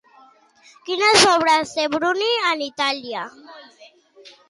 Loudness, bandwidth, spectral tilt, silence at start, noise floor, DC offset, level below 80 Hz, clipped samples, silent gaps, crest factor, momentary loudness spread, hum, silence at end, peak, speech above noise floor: -18 LUFS; 11.5 kHz; -1.5 dB/octave; 0.85 s; -52 dBFS; under 0.1%; -62 dBFS; under 0.1%; none; 18 dB; 17 LU; none; 0.2 s; -4 dBFS; 32 dB